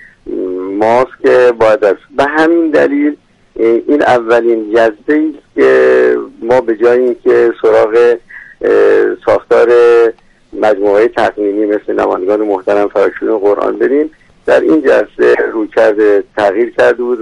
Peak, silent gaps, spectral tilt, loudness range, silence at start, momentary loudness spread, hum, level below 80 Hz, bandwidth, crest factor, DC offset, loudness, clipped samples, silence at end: 0 dBFS; none; -6 dB/octave; 2 LU; 0.25 s; 7 LU; none; -48 dBFS; 10 kHz; 10 dB; under 0.1%; -10 LUFS; under 0.1%; 0 s